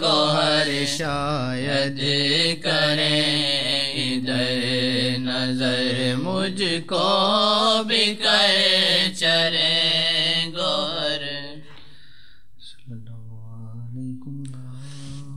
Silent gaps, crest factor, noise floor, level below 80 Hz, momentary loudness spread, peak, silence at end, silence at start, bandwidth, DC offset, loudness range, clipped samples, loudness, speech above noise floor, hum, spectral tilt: none; 18 dB; -54 dBFS; -56 dBFS; 20 LU; -4 dBFS; 0 s; 0 s; 14.5 kHz; 1%; 17 LU; under 0.1%; -20 LUFS; 33 dB; none; -3.5 dB/octave